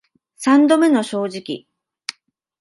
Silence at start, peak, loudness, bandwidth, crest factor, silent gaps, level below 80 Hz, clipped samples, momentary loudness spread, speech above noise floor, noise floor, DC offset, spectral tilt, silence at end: 0.4 s; -2 dBFS; -16 LUFS; 11.5 kHz; 16 dB; none; -72 dBFS; under 0.1%; 19 LU; 39 dB; -55 dBFS; under 0.1%; -4.5 dB/octave; 0.5 s